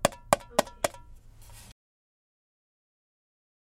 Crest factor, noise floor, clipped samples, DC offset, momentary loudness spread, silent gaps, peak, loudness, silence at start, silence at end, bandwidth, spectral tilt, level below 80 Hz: 30 dB; -50 dBFS; under 0.1%; under 0.1%; 24 LU; none; -4 dBFS; -29 LUFS; 0.05 s; 2.8 s; 16.5 kHz; -3 dB/octave; -54 dBFS